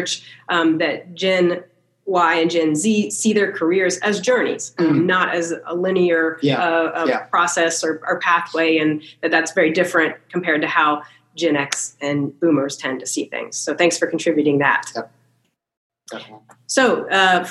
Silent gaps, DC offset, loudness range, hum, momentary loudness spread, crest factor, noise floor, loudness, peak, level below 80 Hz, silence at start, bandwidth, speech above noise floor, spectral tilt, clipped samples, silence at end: 15.77-15.90 s; under 0.1%; 3 LU; none; 8 LU; 18 dB; -66 dBFS; -18 LUFS; 0 dBFS; -80 dBFS; 0 s; 12.5 kHz; 47 dB; -3.5 dB/octave; under 0.1%; 0 s